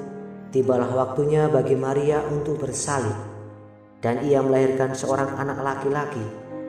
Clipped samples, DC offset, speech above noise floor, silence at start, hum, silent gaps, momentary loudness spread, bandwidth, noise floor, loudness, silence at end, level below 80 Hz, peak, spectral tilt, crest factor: under 0.1%; under 0.1%; 24 dB; 0 s; none; none; 14 LU; 11.5 kHz; -46 dBFS; -23 LUFS; 0 s; -56 dBFS; -8 dBFS; -6 dB/octave; 16 dB